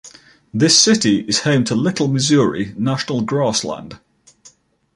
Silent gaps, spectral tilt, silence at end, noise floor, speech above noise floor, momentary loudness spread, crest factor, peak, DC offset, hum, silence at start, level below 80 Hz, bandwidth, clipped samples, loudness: none; -4 dB/octave; 1 s; -50 dBFS; 34 dB; 11 LU; 18 dB; 0 dBFS; under 0.1%; none; 0.05 s; -54 dBFS; 11.5 kHz; under 0.1%; -16 LUFS